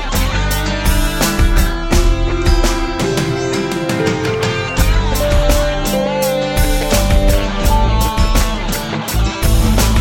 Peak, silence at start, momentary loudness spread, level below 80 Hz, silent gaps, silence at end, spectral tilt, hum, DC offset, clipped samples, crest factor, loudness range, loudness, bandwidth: 0 dBFS; 0 s; 4 LU; -16 dBFS; none; 0 s; -4.5 dB/octave; none; under 0.1%; under 0.1%; 12 dB; 1 LU; -16 LUFS; 17 kHz